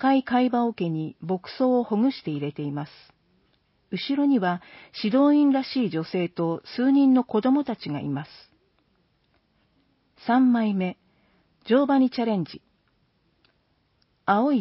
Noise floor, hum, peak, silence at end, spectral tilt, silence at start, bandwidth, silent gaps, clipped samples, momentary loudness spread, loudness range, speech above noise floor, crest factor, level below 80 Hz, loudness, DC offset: -68 dBFS; none; -8 dBFS; 0 s; -11 dB/octave; 0 s; 5.8 kHz; none; under 0.1%; 13 LU; 5 LU; 45 dB; 16 dB; -70 dBFS; -24 LUFS; under 0.1%